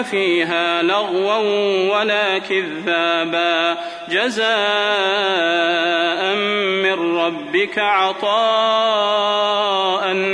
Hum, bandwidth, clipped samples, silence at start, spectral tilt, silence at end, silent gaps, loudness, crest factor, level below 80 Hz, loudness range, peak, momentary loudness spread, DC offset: none; 10.5 kHz; under 0.1%; 0 s; -3.5 dB/octave; 0 s; none; -17 LUFS; 14 dB; -66 dBFS; 1 LU; -4 dBFS; 3 LU; under 0.1%